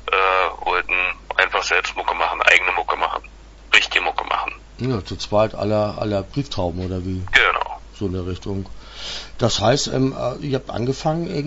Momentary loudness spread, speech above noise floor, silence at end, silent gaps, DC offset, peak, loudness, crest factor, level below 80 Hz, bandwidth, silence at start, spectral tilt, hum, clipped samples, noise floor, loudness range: 13 LU; 20 dB; 0 s; none; under 0.1%; 0 dBFS; -20 LUFS; 20 dB; -40 dBFS; 8 kHz; 0 s; -4 dB/octave; none; under 0.1%; -41 dBFS; 5 LU